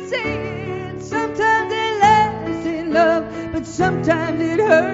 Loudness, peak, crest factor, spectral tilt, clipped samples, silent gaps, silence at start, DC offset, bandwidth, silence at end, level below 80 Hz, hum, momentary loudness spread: -19 LUFS; 0 dBFS; 18 dB; -4 dB/octave; under 0.1%; none; 0 s; under 0.1%; 8 kHz; 0 s; -46 dBFS; none; 12 LU